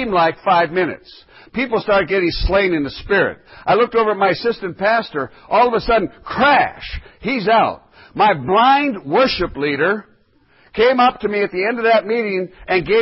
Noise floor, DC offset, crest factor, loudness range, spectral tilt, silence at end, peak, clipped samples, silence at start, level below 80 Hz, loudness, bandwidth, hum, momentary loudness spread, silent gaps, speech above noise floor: -54 dBFS; under 0.1%; 14 dB; 2 LU; -9.5 dB/octave; 0 s; -4 dBFS; under 0.1%; 0 s; -36 dBFS; -17 LUFS; 5.8 kHz; none; 11 LU; none; 38 dB